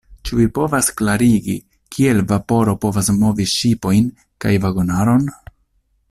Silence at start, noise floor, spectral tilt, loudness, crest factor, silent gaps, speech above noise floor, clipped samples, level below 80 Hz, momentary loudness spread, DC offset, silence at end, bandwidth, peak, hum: 0.1 s; -62 dBFS; -5.5 dB/octave; -17 LUFS; 14 dB; none; 47 dB; under 0.1%; -40 dBFS; 8 LU; under 0.1%; 0.75 s; 14.5 kHz; -2 dBFS; none